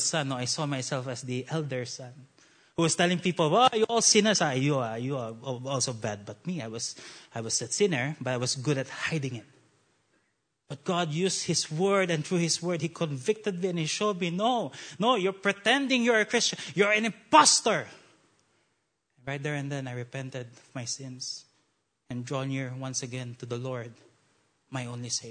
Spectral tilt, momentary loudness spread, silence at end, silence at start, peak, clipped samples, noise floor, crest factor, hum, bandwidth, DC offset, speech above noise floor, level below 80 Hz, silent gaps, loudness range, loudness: -3.5 dB/octave; 16 LU; 0 s; 0 s; -6 dBFS; under 0.1%; -76 dBFS; 24 dB; none; 9.6 kHz; under 0.1%; 48 dB; -74 dBFS; none; 12 LU; -28 LUFS